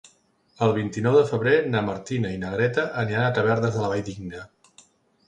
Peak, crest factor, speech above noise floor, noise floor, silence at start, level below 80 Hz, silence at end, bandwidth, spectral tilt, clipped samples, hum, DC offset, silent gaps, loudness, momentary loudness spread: -6 dBFS; 18 dB; 39 dB; -62 dBFS; 0.6 s; -54 dBFS; 0.8 s; 9.4 kHz; -6.5 dB/octave; under 0.1%; none; under 0.1%; none; -23 LUFS; 10 LU